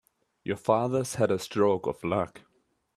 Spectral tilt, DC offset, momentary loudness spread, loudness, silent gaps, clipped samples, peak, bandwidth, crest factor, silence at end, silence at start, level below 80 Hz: -6 dB/octave; under 0.1%; 10 LU; -28 LUFS; none; under 0.1%; -8 dBFS; 14 kHz; 20 dB; 0.6 s; 0.45 s; -64 dBFS